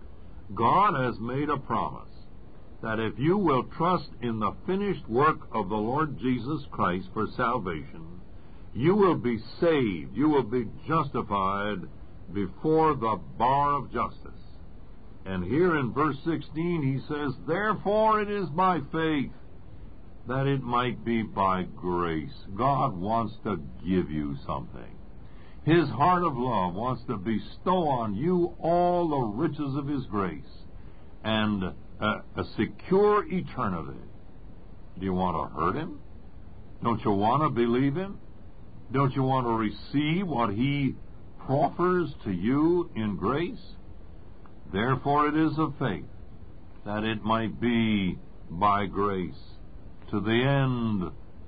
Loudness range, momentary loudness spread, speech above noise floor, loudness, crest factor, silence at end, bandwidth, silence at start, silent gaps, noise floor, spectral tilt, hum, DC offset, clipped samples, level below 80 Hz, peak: 3 LU; 12 LU; 22 dB; -27 LUFS; 18 dB; 0 s; 5 kHz; 0 s; none; -48 dBFS; -11 dB/octave; none; 0.8%; under 0.1%; -48 dBFS; -10 dBFS